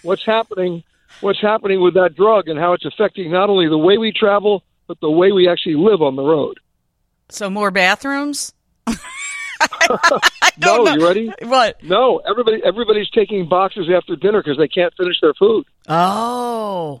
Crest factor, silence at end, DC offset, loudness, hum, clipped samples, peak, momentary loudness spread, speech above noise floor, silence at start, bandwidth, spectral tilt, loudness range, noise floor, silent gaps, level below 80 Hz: 16 dB; 0.05 s; under 0.1%; -15 LUFS; none; under 0.1%; 0 dBFS; 11 LU; 52 dB; 0.05 s; 15.5 kHz; -4 dB/octave; 3 LU; -67 dBFS; none; -54 dBFS